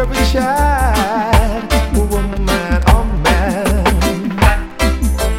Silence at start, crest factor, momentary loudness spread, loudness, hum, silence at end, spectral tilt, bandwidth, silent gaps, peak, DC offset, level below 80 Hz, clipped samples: 0 s; 14 dB; 4 LU; -15 LUFS; none; 0 s; -5.5 dB/octave; 16.5 kHz; none; 0 dBFS; under 0.1%; -16 dBFS; under 0.1%